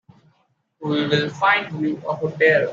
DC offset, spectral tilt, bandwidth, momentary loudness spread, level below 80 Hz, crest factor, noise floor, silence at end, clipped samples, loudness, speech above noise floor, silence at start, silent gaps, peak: under 0.1%; -6 dB/octave; 7.4 kHz; 9 LU; -64 dBFS; 18 dB; -66 dBFS; 0 s; under 0.1%; -20 LUFS; 46 dB; 0.8 s; none; -4 dBFS